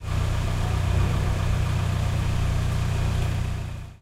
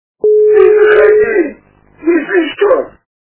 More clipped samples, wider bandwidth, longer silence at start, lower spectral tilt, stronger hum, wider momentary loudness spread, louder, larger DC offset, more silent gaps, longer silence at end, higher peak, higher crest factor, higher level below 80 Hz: second, under 0.1% vs 0.5%; first, 14.5 kHz vs 4 kHz; second, 0 s vs 0.25 s; second, -6 dB/octave vs -8.5 dB/octave; neither; second, 4 LU vs 10 LU; second, -26 LUFS vs -10 LUFS; neither; neither; second, 0.05 s vs 0.45 s; second, -12 dBFS vs 0 dBFS; about the same, 12 dB vs 10 dB; first, -30 dBFS vs -48 dBFS